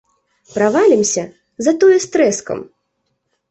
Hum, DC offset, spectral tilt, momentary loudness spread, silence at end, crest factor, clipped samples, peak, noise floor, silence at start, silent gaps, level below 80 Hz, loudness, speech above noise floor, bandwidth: none; under 0.1%; -4 dB/octave; 15 LU; 0.85 s; 14 dB; under 0.1%; -2 dBFS; -70 dBFS; 0.55 s; none; -60 dBFS; -14 LUFS; 56 dB; 8.4 kHz